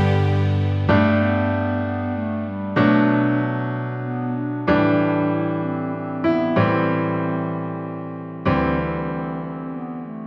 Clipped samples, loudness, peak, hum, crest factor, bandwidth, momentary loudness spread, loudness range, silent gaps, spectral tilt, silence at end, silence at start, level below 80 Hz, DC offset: under 0.1%; -21 LUFS; -4 dBFS; none; 16 dB; 6 kHz; 11 LU; 3 LU; none; -9.5 dB/octave; 0 s; 0 s; -46 dBFS; under 0.1%